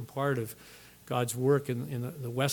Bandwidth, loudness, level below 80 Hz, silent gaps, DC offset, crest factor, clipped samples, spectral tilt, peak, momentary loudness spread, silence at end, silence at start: 19 kHz; -32 LUFS; -68 dBFS; none; under 0.1%; 18 dB; under 0.1%; -5.5 dB/octave; -12 dBFS; 19 LU; 0 s; 0 s